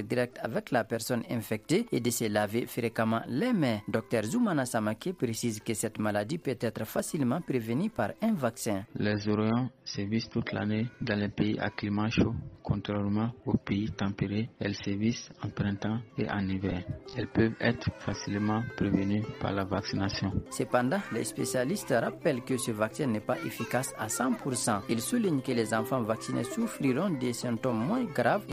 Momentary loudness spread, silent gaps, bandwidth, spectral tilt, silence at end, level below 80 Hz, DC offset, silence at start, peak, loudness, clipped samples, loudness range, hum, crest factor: 5 LU; none; 15.5 kHz; -5.5 dB/octave; 0 s; -56 dBFS; under 0.1%; 0 s; -12 dBFS; -31 LUFS; under 0.1%; 2 LU; none; 18 dB